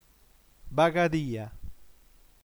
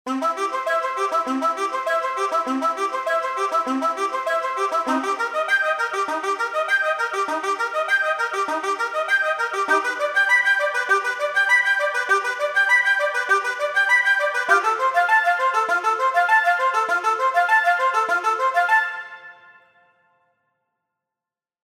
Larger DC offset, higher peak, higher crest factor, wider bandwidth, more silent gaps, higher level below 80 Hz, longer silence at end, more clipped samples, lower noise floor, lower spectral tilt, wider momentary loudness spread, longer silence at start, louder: neither; second, -10 dBFS vs -4 dBFS; about the same, 20 dB vs 18 dB; first, over 20 kHz vs 16.5 kHz; neither; first, -52 dBFS vs -80 dBFS; second, 0.6 s vs 2.3 s; neither; second, -60 dBFS vs -89 dBFS; first, -6.5 dB/octave vs -0.5 dB/octave; first, 19 LU vs 7 LU; first, 0.65 s vs 0.05 s; second, -27 LUFS vs -20 LUFS